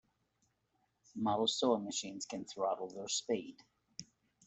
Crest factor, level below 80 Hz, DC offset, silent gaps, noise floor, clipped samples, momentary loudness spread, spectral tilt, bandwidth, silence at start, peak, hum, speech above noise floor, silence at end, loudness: 22 dB; -80 dBFS; under 0.1%; none; -80 dBFS; under 0.1%; 19 LU; -3 dB/octave; 8.2 kHz; 1.15 s; -18 dBFS; none; 43 dB; 0.45 s; -37 LUFS